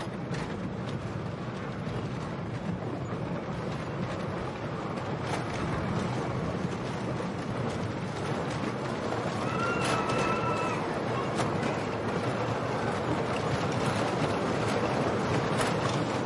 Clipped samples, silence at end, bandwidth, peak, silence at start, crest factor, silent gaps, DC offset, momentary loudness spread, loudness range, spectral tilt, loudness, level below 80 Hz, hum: under 0.1%; 0 s; 11.5 kHz; -14 dBFS; 0 s; 16 dB; none; under 0.1%; 7 LU; 5 LU; -6 dB/octave; -31 LUFS; -54 dBFS; none